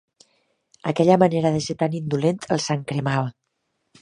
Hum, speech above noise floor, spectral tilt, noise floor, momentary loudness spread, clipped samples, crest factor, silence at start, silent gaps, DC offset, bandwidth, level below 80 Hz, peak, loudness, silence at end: none; 54 dB; -6 dB/octave; -74 dBFS; 9 LU; under 0.1%; 20 dB; 0.85 s; none; under 0.1%; 11 kHz; -58 dBFS; -2 dBFS; -22 LUFS; 0.7 s